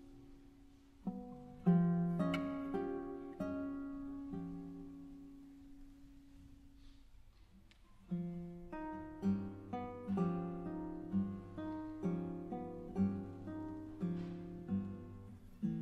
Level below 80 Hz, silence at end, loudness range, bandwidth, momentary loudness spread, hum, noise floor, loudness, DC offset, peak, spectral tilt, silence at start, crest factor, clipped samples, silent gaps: -62 dBFS; 0 s; 13 LU; 6 kHz; 21 LU; none; -63 dBFS; -42 LUFS; under 0.1%; -22 dBFS; -9.5 dB/octave; 0 s; 20 dB; under 0.1%; none